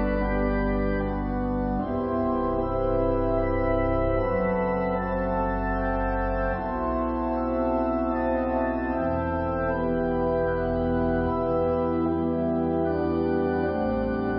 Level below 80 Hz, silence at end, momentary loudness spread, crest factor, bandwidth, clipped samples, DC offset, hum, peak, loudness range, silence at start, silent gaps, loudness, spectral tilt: -34 dBFS; 0 s; 2 LU; 12 dB; 5.6 kHz; under 0.1%; under 0.1%; none; -12 dBFS; 1 LU; 0 s; none; -26 LUFS; -12 dB/octave